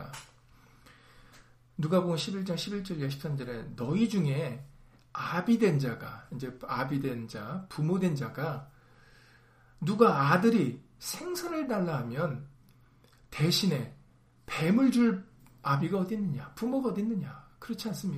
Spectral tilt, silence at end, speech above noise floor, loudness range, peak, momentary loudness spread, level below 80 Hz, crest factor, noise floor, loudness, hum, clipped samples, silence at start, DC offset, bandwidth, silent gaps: -6 dB/octave; 0 s; 31 dB; 5 LU; -8 dBFS; 16 LU; -62 dBFS; 24 dB; -61 dBFS; -30 LUFS; none; under 0.1%; 0 s; under 0.1%; 15.5 kHz; none